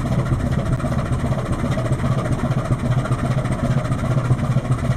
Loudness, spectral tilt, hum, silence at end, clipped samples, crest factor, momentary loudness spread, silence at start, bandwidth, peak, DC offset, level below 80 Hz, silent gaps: -21 LUFS; -7.5 dB/octave; none; 0 s; under 0.1%; 14 dB; 2 LU; 0 s; 12 kHz; -4 dBFS; under 0.1%; -30 dBFS; none